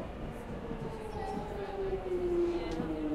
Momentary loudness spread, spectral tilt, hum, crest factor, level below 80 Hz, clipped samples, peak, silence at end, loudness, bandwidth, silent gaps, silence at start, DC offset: 10 LU; -7.5 dB/octave; none; 14 dB; -46 dBFS; under 0.1%; -22 dBFS; 0 s; -37 LUFS; 12.5 kHz; none; 0 s; under 0.1%